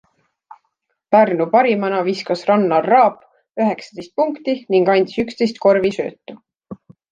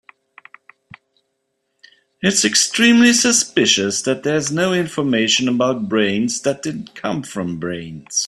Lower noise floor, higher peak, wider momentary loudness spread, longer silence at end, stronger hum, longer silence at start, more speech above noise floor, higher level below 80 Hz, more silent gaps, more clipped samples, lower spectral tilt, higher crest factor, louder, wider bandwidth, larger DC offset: about the same, -72 dBFS vs -72 dBFS; about the same, -2 dBFS vs 0 dBFS; second, 9 LU vs 14 LU; first, 0.4 s vs 0 s; neither; second, 1.1 s vs 2.2 s; about the same, 55 dB vs 54 dB; about the same, -62 dBFS vs -58 dBFS; neither; neither; first, -6.5 dB/octave vs -2.5 dB/octave; about the same, 16 dB vs 18 dB; about the same, -17 LUFS vs -16 LUFS; second, 9 kHz vs 13.5 kHz; neither